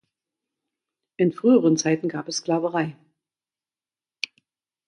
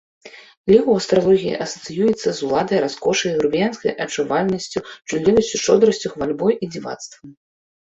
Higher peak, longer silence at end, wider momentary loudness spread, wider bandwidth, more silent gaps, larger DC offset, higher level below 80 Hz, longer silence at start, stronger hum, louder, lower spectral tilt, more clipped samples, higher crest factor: second, -6 dBFS vs -2 dBFS; first, 1.95 s vs 0.5 s; about the same, 15 LU vs 13 LU; first, 11 kHz vs 8 kHz; second, none vs 0.57-0.64 s; neither; second, -74 dBFS vs -52 dBFS; first, 1.2 s vs 0.25 s; neither; second, -23 LUFS vs -19 LUFS; about the same, -5 dB/octave vs -4.5 dB/octave; neither; about the same, 20 dB vs 18 dB